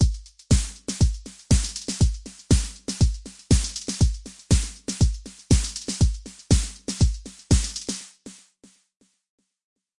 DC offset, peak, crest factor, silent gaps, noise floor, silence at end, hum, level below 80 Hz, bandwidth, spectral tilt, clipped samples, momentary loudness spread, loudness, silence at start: 0.2%; -6 dBFS; 18 dB; none; -57 dBFS; 1.65 s; none; -28 dBFS; 11.5 kHz; -5 dB/octave; under 0.1%; 15 LU; -24 LUFS; 0 s